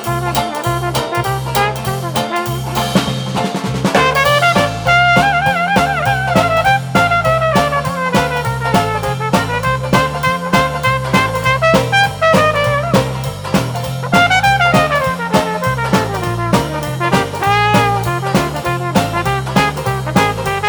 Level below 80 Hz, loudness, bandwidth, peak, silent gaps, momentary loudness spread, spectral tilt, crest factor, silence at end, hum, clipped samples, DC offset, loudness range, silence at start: -34 dBFS; -14 LUFS; over 20 kHz; 0 dBFS; none; 7 LU; -5 dB/octave; 14 dB; 0 s; none; under 0.1%; under 0.1%; 3 LU; 0 s